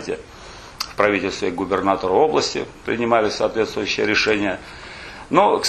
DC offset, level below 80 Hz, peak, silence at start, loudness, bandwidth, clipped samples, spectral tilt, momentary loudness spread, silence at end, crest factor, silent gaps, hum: under 0.1%; -48 dBFS; -2 dBFS; 0 s; -20 LUFS; 13 kHz; under 0.1%; -4 dB/octave; 18 LU; 0 s; 20 dB; none; none